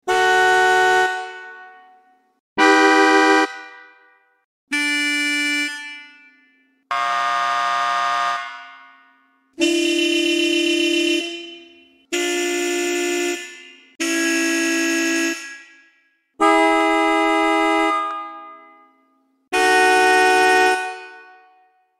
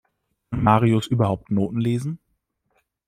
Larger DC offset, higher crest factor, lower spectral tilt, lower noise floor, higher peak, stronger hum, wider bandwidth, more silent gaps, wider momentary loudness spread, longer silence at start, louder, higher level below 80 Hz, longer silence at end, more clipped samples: neither; about the same, 18 dB vs 20 dB; second, -1 dB/octave vs -7.5 dB/octave; second, -62 dBFS vs -73 dBFS; about the same, -2 dBFS vs -2 dBFS; neither; first, 16 kHz vs 13 kHz; first, 2.40-2.56 s, 4.44-4.67 s vs none; first, 17 LU vs 14 LU; second, 0.05 s vs 0.5 s; first, -17 LUFS vs -22 LUFS; second, -62 dBFS vs -48 dBFS; second, 0.75 s vs 0.9 s; neither